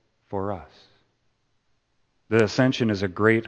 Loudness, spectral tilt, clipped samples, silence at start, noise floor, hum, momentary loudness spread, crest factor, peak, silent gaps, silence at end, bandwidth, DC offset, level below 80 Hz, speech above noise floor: -24 LUFS; -6.5 dB/octave; under 0.1%; 0.3 s; -70 dBFS; none; 13 LU; 22 dB; -4 dBFS; none; 0 s; 8.8 kHz; under 0.1%; -60 dBFS; 47 dB